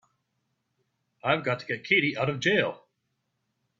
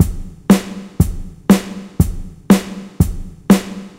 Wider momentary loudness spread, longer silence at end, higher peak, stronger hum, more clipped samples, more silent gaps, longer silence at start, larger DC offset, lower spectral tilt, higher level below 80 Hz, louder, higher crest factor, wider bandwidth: second, 8 LU vs 15 LU; first, 1.05 s vs 0.1 s; second, -8 dBFS vs 0 dBFS; neither; neither; neither; first, 1.25 s vs 0 s; neither; second, -5 dB/octave vs -6.5 dB/octave; second, -68 dBFS vs -26 dBFS; second, -26 LUFS vs -16 LUFS; first, 22 dB vs 16 dB; second, 7.8 kHz vs 16.5 kHz